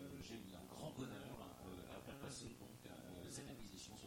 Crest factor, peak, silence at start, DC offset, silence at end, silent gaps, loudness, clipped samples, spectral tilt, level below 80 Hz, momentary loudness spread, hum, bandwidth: 16 dB; -38 dBFS; 0 s; under 0.1%; 0 s; none; -54 LUFS; under 0.1%; -4.5 dB/octave; -70 dBFS; 5 LU; none; 16.5 kHz